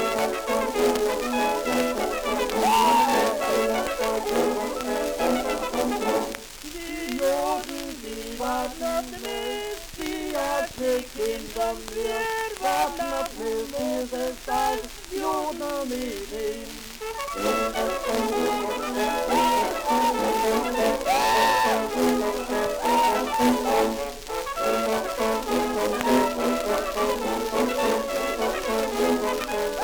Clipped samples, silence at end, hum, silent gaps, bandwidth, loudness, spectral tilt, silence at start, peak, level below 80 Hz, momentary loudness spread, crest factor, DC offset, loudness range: under 0.1%; 0 s; none; none; over 20 kHz; -25 LUFS; -3 dB/octave; 0 s; -4 dBFS; -46 dBFS; 9 LU; 20 dB; under 0.1%; 6 LU